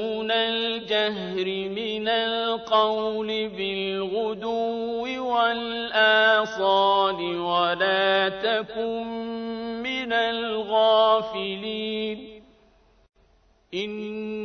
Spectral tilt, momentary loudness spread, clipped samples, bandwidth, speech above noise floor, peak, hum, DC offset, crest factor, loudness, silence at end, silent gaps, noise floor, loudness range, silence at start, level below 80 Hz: -4.5 dB/octave; 11 LU; under 0.1%; 6.6 kHz; 37 dB; -8 dBFS; none; under 0.1%; 18 dB; -24 LUFS; 0 s; none; -61 dBFS; 4 LU; 0 s; -62 dBFS